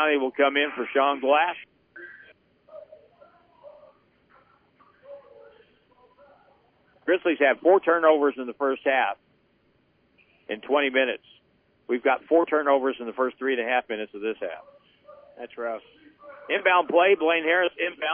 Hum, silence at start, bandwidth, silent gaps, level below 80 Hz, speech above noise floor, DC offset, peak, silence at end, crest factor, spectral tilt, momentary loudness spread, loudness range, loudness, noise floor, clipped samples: none; 0 s; 3.6 kHz; none; -76 dBFS; 42 dB; under 0.1%; -6 dBFS; 0 s; 20 dB; -7 dB/octave; 16 LU; 7 LU; -23 LUFS; -65 dBFS; under 0.1%